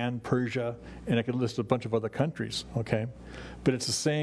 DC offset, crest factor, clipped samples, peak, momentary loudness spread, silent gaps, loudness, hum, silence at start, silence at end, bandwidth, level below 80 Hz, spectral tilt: under 0.1%; 20 dB; under 0.1%; -10 dBFS; 9 LU; none; -30 LUFS; none; 0 s; 0 s; 11 kHz; -54 dBFS; -5 dB/octave